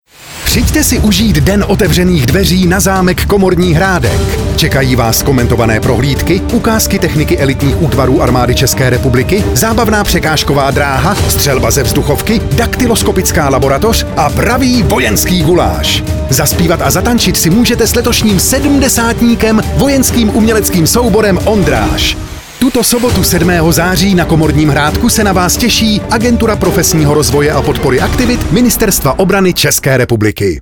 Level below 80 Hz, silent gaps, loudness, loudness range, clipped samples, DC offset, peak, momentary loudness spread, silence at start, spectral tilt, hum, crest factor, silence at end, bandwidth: -20 dBFS; none; -9 LUFS; 1 LU; under 0.1%; under 0.1%; 0 dBFS; 3 LU; 0.2 s; -4.5 dB/octave; none; 10 dB; 0 s; 20 kHz